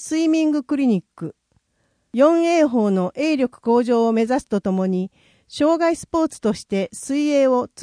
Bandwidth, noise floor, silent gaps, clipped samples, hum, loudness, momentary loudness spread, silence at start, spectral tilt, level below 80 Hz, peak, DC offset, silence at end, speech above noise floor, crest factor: 10.5 kHz; -68 dBFS; none; under 0.1%; none; -19 LUFS; 8 LU; 0 s; -6 dB/octave; -58 dBFS; -4 dBFS; under 0.1%; 0 s; 49 dB; 16 dB